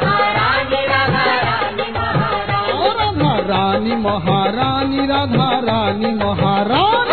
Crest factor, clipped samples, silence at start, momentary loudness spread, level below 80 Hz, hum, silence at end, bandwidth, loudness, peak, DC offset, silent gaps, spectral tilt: 12 dB; under 0.1%; 0 s; 4 LU; -40 dBFS; none; 0 s; 4.6 kHz; -16 LUFS; -4 dBFS; 0.9%; none; -8.5 dB/octave